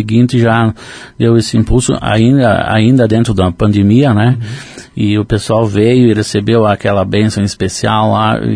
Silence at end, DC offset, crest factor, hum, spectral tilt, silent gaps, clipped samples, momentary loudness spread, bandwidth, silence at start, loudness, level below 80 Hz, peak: 0 s; under 0.1%; 10 dB; none; -6.5 dB/octave; none; under 0.1%; 7 LU; 10.5 kHz; 0 s; -11 LUFS; -30 dBFS; 0 dBFS